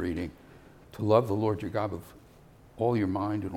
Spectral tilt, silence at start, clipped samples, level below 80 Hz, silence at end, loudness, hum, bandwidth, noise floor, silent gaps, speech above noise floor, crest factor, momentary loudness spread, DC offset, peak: -8.5 dB/octave; 0 s; under 0.1%; -58 dBFS; 0 s; -29 LUFS; none; 16.5 kHz; -55 dBFS; none; 26 dB; 22 dB; 14 LU; under 0.1%; -8 dBFS